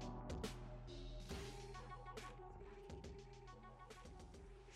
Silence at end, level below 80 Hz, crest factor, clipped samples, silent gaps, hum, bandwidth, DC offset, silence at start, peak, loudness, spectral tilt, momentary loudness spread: 0 s; -58 dBFS; 18 dB; under 0.1%; none; none; 15 kHz; under 0.1%; 0 s; -34 dBFS; -55 LUFS; -5 dB/octave; 10 LU